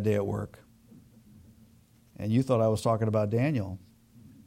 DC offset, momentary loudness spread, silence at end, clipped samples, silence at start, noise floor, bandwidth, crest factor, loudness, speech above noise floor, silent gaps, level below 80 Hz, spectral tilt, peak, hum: under 0.1%; 14 LU; 0.2 s; under 0.1%; 0 s; -60 dBFS; 15.5 kHz; 16 dB; -28 LUFS; 33 dB; none; -60 dBFS; -8 dB/octave; -14 dBFS; none